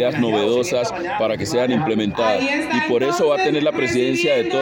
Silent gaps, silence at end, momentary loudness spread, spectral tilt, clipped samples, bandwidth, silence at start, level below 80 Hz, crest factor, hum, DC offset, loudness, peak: none; 0 s; 4 LU; -5 dB/octave; under 0.1%; 17 kHz; 0 s; -54 dBFS; 12 dB; none; under 0.1%; -19 LUFS; -6 dBFS